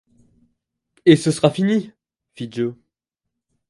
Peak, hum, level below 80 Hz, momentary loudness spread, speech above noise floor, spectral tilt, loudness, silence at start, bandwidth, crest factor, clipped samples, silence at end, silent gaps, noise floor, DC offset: 0 dBFS; none; -62 dBFS; 17 LU; 65 dB; -6 dB/octave; -18 LUFS; 1.05 s; 11.5 kHz; 20 dB; under 0.1%; 0.95 s; none; -82 dBFS; under 0.1%